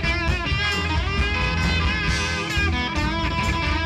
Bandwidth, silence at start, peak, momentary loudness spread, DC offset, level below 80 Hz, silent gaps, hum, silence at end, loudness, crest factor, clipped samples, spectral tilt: 13 kHz; 0 s; -8 dBFS; 2 LU; under 0.1%; -28 dBFS; none; none; 0 s; -22 LUFS; 14 dB; under 0.1%; -4.5 dB/octave